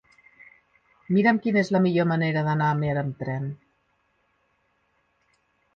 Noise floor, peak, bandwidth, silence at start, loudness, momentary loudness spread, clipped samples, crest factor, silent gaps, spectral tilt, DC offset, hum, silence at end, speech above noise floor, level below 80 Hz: -70 dBFS; -8 dBFS; 7.2 kHz; 1.1 s; -24 LUFS; 10 LU; under 0.1%; 18 dB; none; -8 dB/octave; under 0.1%; none; 2.2 s; 47 dB; -62 dBFS